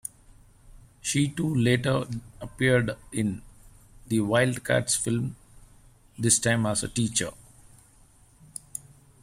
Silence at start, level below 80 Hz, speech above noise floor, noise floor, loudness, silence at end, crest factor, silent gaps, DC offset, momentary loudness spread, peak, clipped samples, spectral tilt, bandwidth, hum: 0.65 s; -54 dBFS; 32 dB; -57 dBFS; -26 LUFS; 0.45 s; 22 dB; none; under 0.1%; 17 LU; -6 dBFS; under 0.1%; -4.5 dB/octave; 16 kHz; none